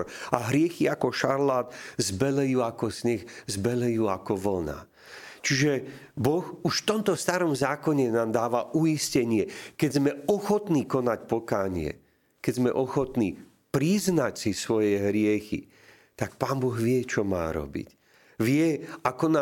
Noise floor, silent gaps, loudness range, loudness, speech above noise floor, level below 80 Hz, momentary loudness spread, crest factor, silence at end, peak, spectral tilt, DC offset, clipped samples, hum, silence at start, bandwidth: -47 dBFS; none; 3 LU; -27 LUFS; 20 dB; -56 dBFS; 9 LU; 24 dB; 0 s; -2 dBFS; -5.5 dB/octave; under 0.1%; under 0.1%; none; 0 s; 17 kHz